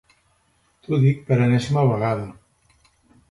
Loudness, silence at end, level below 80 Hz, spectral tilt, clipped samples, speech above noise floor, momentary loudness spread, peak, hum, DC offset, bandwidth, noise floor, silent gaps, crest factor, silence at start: -20 LUFS; 1 s; -54 dBFS; -8 dB/octave; under 0.1%; 45 dB; 8 LU; -6 dBFS; none; under 0.1%; 11.5 kHz; -64 dBFS; none; 16 dB; 0.9 s